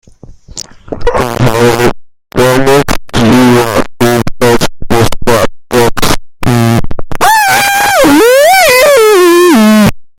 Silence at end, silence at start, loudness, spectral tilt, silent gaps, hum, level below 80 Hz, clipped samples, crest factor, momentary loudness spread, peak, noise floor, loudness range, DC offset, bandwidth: 0.15 s; 0.3 s; -7 LUFS; -4.5 dB/octave; none; none; -24 dBFS; 0.8%; 6 dB; 10 LU; 0 dBFS; -32 dBFS; 5 LU; under 0.1%; over 20 kHz